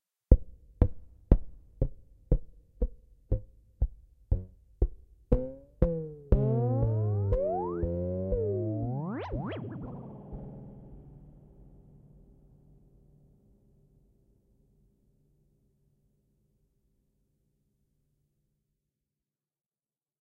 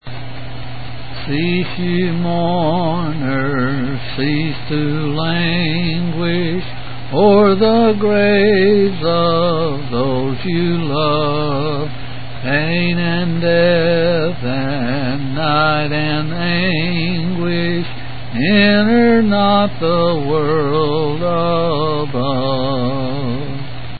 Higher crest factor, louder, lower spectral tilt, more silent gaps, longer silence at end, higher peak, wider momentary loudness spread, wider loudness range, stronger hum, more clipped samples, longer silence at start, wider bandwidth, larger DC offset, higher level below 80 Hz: first, 30 dB vs 16 dB; second, -32 LUFS vs -16 LUFS; about the same, -11.5 dB/octave vs -12 dB/octave; neither; first, 9 s vs 0 s; second, -4 dBFS vs 0 dBFS; first, 17 LU vs 11 LU; first, 15 LU vs 5 LU; neither; neither; first, 0.3 s vs 0 s; second, 3.5 kHz vs 4.8 kHz; second, under 0.1% vs 7%; about the same, -36 dBFS vs -38 dBFS